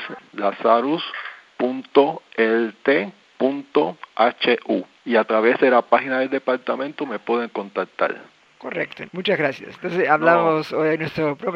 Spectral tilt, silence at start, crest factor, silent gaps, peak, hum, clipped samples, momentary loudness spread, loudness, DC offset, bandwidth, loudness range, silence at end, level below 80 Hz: -7 dB/octave; 0 s; 20 dB; none; 0 dBFS; none; under 0.1%; 11 LU; -21 LUFS; under 0.1%; 7.2 kHz; 5 LU; 0 s; -70 dBFS